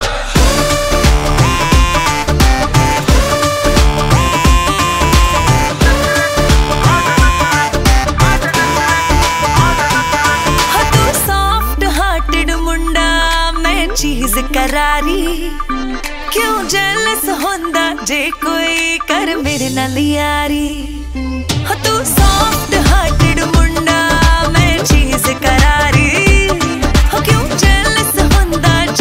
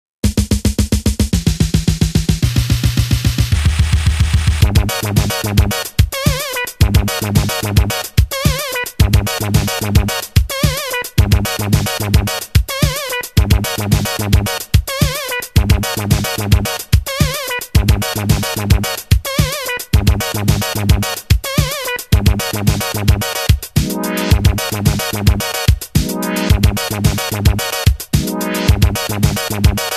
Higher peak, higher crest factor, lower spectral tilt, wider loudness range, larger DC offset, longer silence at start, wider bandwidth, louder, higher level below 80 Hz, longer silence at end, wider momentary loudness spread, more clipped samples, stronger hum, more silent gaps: about the same, 0 dBFS vs 0 dBFS; about the same, 12 dB vs 14 dB; about the same, -4 dB/octave vs -4.5 dB/octave; first, 4 LU vs 1 LU; second, under 0.1% vs 0.2%; second, 0 s vs 0.25 s; first, 16.5 kHz vs 14.5 kHz; first, -12 LUFS vs -15 LUFS; about the same, -16 dBFS vs -20 dBFS; about the same, 0 s vs 0 s; about the same, 5 LU vs 3 LU; neither; neither; neither